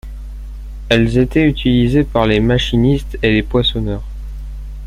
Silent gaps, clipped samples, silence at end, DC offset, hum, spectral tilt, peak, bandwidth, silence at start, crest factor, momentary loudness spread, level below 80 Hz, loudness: none; under 0.1%; 0 s; under 0.1%; none; -7 dB/octave; 0 dBFS; 13 kHz; 0.05 s; 14 dB; 19 LU; -26 dBFS; -14 LUFS